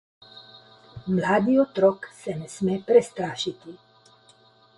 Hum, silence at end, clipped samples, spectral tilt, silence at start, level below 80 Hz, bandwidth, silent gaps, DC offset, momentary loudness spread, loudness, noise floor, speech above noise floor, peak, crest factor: none; 1 s; under 0.1%; -6 dB/octave; 0.35 s; -62 dBFS; 11.5 kHz; none; under 0.1%; 19 LU; -24 LUFS; -57 dBFS; 34 dB; -6 dBFS; 20 dB